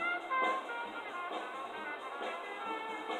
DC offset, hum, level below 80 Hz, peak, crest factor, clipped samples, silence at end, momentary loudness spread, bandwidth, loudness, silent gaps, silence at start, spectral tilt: under 0.1%; none; -86 dBFS; -20 dBFS; 20 dB; under 0.1%; 0 s; 8 LU; 15.5 kHz; -38 LUFS; none; 0 s; -2.5 dB/octave